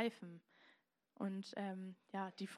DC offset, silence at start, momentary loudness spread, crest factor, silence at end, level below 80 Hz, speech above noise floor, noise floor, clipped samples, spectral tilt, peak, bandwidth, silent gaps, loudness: under 0.1%; 0 s; 12 LU; 22 dB; 0 s; under -90 dBFS; 28 dB; -75 dBFS; under 0.1%; -6 dB/octave; -26 dBFS; 13 kHz; none; -47 LUFS